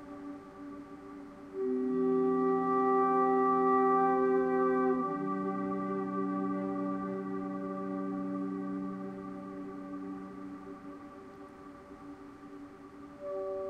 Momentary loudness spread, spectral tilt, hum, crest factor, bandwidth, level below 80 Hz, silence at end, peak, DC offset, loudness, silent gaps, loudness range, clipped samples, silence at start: 22 LU; -9 dB/octave; none; 16 dB; 5.6 kHz; -68 dBFS; 0 s; -18 dBFS; under 0.1%; -32 LUFS; none; 17 LU; under 0.1%; 0 s